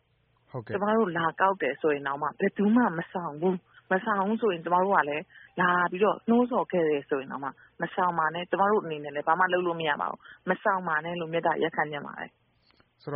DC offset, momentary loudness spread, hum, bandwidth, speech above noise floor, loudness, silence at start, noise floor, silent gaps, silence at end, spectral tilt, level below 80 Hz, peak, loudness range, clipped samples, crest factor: under 0.1%; 12 LU; none; 4.3 kHz; 41 dB; -27 LUFS; 0.55 s; -68 dBFS; none; 0 s; -4 dB/octave; -72 dBFS; -8 dBFS; 2 LU; under 0.1%; 20 dB